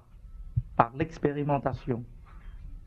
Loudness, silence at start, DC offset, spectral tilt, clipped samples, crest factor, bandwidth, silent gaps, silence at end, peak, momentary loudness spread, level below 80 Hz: -30 LUFS; 0.15 s; under 0.1%; -9 dB/octave; under 0.1%; 28 dB; 7.2 kHz; none; 0 s; -4 dBFS; 22 LU; -46 dBFS